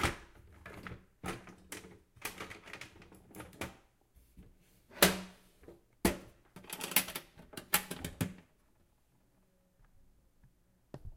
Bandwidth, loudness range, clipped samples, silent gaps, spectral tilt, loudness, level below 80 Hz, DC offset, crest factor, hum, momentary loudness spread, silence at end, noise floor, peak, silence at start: 16.5 kHz; 14 LU; under 0.1%; none; -3 dB/octave; -36 LUFS; -56 dBFS; under 0.1%; 34 dB; none; 25 LU; 0 s; -71 dBFS; -8 dBFS; 0 s